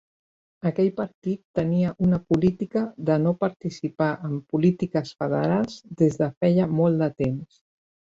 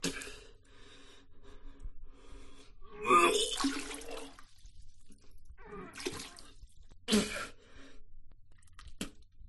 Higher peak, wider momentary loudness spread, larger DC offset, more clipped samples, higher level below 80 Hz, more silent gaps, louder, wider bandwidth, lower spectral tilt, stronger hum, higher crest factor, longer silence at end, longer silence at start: first, -6 dBFS vs -14 dBFS; second, 8 LU vs 29 LU; neither; neither; about the same, -56 dBFS vs -52 dBFS; first, 1.14-1.22 s, 1.45-1.54 s, 3.56-3.60 s, 6.37-6.41 s vs none; first, -24 LUFS vs -33 LUFS; second, 7.6 kHz vs 12 kHz; first, -8.5 dB/octave vs -3 dB/octave; neither; second, 18 dB vs 24 dB; first, 0.55 s vs 0 s; first, 0.65 s vs 0 s